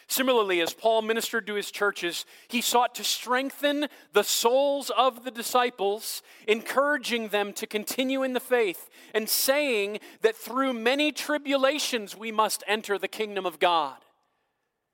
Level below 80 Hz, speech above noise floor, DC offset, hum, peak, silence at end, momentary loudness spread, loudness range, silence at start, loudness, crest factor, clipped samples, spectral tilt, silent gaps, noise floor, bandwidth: -84 dBFS; 52 dB; under 0.1%; none; -6 dBFS; 0.95 s; 8 LU; 2 LU; 0.1 s; -26 LUFS; 20 dB; under 0.1%; -1.5 dB/octave; none; -78 dBFS; 17 kHz